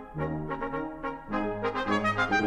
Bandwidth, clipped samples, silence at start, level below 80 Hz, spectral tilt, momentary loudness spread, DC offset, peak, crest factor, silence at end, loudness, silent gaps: 11.5 kHz; under 0.1%; 0 s; -48 dBFS; -6 dB/octave; 8 LU; under 0.1%; -14 dBFS; 16 dB; 0 s; -31 LUFS; none